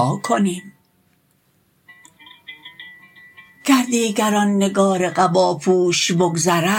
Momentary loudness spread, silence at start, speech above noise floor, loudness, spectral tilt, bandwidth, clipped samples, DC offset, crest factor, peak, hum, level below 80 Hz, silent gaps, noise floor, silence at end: 22 LU; 0 s; 44 dB; -17 LUFS; -4.5 dB/octave; 17 kHz; under 0.1%; under 0.1%; 18 dB; -2 dBFS; none; -66 dBFS; none; -61 dBFS; 0 s